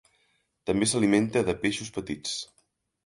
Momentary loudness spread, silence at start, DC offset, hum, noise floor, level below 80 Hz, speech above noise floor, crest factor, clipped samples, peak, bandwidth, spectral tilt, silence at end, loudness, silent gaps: 12 LU; 0.65 s; under 0.1%; none; -71 dBFS; -56 dBFS; 45 dB; 20 dB; under 0.1%; -8 dBFS; 11.5 kHz; -4 dB/octave; 0.6 s; -27 LUFS; none